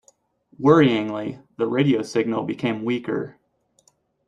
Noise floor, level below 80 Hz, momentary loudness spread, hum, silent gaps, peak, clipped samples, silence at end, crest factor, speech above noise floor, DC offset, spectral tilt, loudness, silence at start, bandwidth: -63 dBFS; -62 dBFS; 13 LU; none; none; -2 dBFS; under 0.1%; 0.95 s; 20 dB; 42 dB; under 0.1%; -7 dB/octave; -21 LUFS; 0.6 s; 10.5 kHz